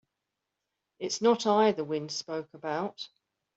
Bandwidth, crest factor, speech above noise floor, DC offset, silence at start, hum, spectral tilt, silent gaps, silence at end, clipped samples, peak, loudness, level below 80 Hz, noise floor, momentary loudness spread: 8 kHz; 20 dB; 57 dB; under 0.1%; 1 s; none; -4 dB/octave; none; 0.5 s; under 0.1%; -12 dBFS; -29 LUFS; -76 dBFS; -86 dBFS; 15 LU